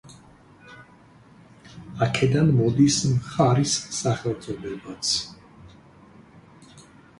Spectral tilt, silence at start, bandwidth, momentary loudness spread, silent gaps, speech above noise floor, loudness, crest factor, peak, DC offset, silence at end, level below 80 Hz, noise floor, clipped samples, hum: -5 dB/octave; 0.05 s; 11.5 kHz; 15 LU; none; 30 dB; -23 LUFS; 20 dB; -6 dBFS; under 0.1%; 0.4 s; -54 dBFS; -52 dBFS; under 0.1%; none